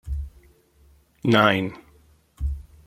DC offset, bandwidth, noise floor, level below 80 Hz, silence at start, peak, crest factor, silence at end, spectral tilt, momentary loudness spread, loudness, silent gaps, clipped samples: under 0.1%; 15.5 kHz; -57 dBFS; -36 dBFS; 0.05 s; -2 dBFS; 24 dB; 0.25 s; -6.5 dB/octave; 16 LU; -23 LUFS; none; under 0.1%